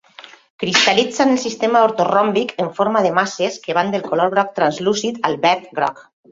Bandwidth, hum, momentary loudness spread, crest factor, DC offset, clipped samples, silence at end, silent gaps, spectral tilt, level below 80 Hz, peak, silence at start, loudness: 7.8 kHz; none; 7 LU; 18 dB; under 0.1%; under 0.1%; 0.3 s; 0.50-0.59 s; -3.5 dB/octave; -62 dBFS; 0 dBFS; 0.2 s; -17 LUFS